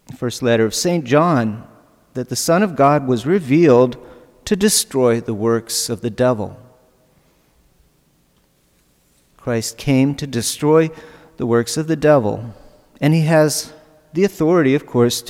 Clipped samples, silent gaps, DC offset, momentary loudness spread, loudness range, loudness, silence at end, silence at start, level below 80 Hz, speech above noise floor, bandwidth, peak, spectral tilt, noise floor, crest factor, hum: under 0.1%; none; under 0.1%; 12 LU; 9 LU; -17 LUFS; 0 s; 0.1 s; -52 dBFS; 43 dB; 16.5 kHz; -2 dBFS; -5 dB/octave; -59 dBFS; 16 dB; none